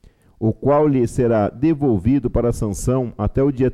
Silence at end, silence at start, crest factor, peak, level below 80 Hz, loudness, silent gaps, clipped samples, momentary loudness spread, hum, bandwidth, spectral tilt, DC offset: 0 s; 0.4 s; 12 dB; -6 dBFS; -34 dBFS; -19 LUFS; none; under 0.1%; 6 LU; none; 14 kHz; -8.5 dB/octave; under 0.1%